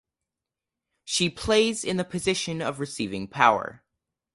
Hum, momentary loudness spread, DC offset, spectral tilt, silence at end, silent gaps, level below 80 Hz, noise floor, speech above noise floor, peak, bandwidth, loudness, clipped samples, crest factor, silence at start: none; 10 LU; under 0.1%; -3.5 dB/octave; 0.6 s; none; -54 dBFS; -88 dBFS; 63 dB; -4 dBFS; 11.5 kHz; -25 LUFS; under 0.1%; 24 dB; 1.05 s